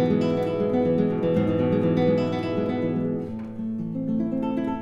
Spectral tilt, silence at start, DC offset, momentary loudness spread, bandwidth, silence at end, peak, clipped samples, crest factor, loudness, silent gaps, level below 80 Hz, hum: -9 dB/octave; 0 s; under 0.1%; 8 LU; 7.4 kHz; 0 s; -10 dBFS; under 0.1%; 14 dB; -24 LUFS; none; -56 dBFS; none